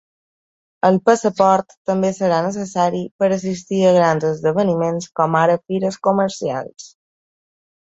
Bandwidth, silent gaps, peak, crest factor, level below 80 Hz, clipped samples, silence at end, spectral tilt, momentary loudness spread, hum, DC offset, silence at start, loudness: 8 kHz; 1.77-1.85 s, 3.11-3.19 s; -2 dBFS; 16 dB; -60 dBFS; under 0.1%; 0.95 s; -6 dB/octave; 7 LU; none; under 0.1%; 0.85 s; -18 LUFS